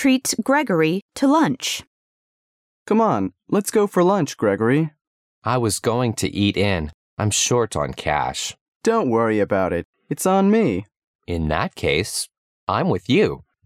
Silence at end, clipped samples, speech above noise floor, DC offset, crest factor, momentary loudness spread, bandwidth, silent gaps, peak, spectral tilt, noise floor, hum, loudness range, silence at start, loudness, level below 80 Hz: 0.3 s; under 0.1%; over 71 dB; under 0.1%; 16 dB; 9 LU; 16 kHz; 1.02-1.09 s, 1.87-2.86 s, 5.01-5.42 s, 6.94-7.17 s, 8.61-8.80 s, 9.85-9.93 s, 11.04-11.19 s, 12.38-12.67 s; -4 dBFS; -4.5 dB/octave; under -90 dBFS; none; 1 LU; 0 s; -20 LUFS; -46 dBFS